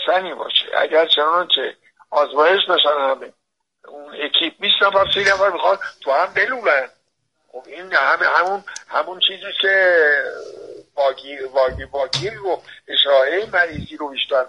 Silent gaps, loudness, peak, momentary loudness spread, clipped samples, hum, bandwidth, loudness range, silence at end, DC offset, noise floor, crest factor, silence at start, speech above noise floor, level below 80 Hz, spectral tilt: none; -17 LUFS; -2 dBFS; 13 LU; under 0.1%; none; 11 kHz; 3 LU; 0 s; under 0.1%; -69 dBFS; 18 dB; 0 s; 51 dB; -52 dBFS; -2.5 dB/octave